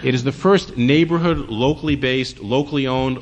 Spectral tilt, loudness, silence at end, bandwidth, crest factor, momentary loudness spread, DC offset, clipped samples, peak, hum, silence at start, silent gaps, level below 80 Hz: -6.5 dB/octave; -18 LUFS; 0 s; 9.2 kHz; 14 dB; 5 LU; under 0.1%; under 0.1%; -4 dBFS; none; 0 s; none; -40 dBFS